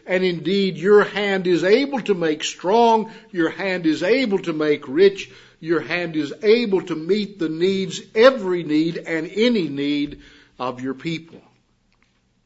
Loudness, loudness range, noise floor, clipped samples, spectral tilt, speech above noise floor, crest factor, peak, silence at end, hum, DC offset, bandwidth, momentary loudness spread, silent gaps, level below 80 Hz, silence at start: -20 LUFS; 5 LU; -63 dBFS; under 0.1%; -5.5 dB/octave; 43 dB; 20 dB; 0 dBFS; 1.1 s; none; under 0.1%; 8 kHz; 12 LU; none; -60 dBFS; 0.05 s